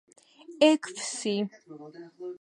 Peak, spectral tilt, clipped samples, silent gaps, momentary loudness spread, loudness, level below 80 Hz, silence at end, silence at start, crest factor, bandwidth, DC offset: -8 dBFS; -3.5 dB/octave; under 0.1%; none; 24 LU; -27 LUFS; -84 dBFS; 0.05 s; 0.5 s; 22 dB; 11.5 kHz; under 0.1%